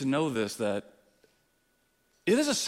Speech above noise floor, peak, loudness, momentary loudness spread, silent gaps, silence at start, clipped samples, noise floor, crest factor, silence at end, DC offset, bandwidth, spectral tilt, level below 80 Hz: 43 dB; -14 dBFS; -30 LUFS; 9 LU; none; 0 s; under 0.1%; -72 dBFS; 18 dB; 0 s; under 0.1%; 16 kHz; -4 dB/octave; -72 dBFS